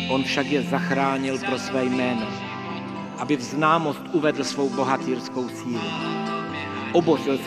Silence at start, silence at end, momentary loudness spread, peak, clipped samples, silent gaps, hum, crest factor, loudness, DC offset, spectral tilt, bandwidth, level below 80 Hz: 0 s; 0 s; 9 LU; -6 dBFS; under 0.1%; none; none; 18 dB; -24 LUFS; under 0.1%; -5 dB/octave; 14 kHz; -64 dBFS